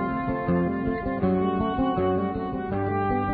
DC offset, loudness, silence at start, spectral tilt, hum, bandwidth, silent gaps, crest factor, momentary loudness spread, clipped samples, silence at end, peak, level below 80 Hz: under 0.1%; -26 LUFS; 0 s; -12 dB/octave; none; 4.8 kHz; none; 14 dB; 4 LU; under 0.1%; 0 s; -12 dBFS; -42 dBFS